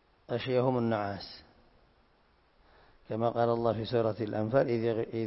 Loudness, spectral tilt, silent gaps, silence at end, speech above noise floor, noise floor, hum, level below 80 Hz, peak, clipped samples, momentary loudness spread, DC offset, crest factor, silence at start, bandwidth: -31 LUFS; -10.5 dB/octave; none; 0 s; 37 dB; -67 dBFS; none; -62 dBFS; -14 dBFS; under 0.1%; 11 LU; under 0.1%; 18 dB; 0.3 s; 5.8 kHz